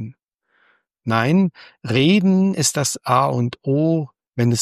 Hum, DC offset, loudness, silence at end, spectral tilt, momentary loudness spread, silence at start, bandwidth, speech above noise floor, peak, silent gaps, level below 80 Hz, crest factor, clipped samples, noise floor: none; under 0.1%; -18 LUFS; 0 s; -5 dB/octave; 11 LU; 0 s; 14 kHz; 47 dB; -2 dBFS; 0.34-0.38 s; -60 dBFS; 16 dB; under 0.1%; -65 dBFS